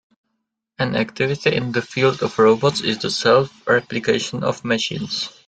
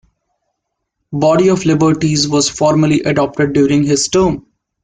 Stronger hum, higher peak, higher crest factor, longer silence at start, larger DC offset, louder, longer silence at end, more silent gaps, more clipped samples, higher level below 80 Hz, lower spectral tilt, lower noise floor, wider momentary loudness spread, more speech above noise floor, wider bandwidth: neither; about the same, -2 dBFS vs -2 dBFS; first, 18 dB vs 12 dB; second, 0.8 s vs 1.1 s; neither; second, -19 LUFS vs -13 LUFS; second, 0.15 s vs 0.45 s; neither; neither; second, -56 dBFS vs -44 dBFS; about the same, -4.5 dB/octave vs -5 dB/octave; about the same, -76 dBFS vs -73 dBFS; first, 7 LU vs 4 LU; second, 57 dB vs 61 dB; about the same, 9.2 kHz vs 9.6 kHz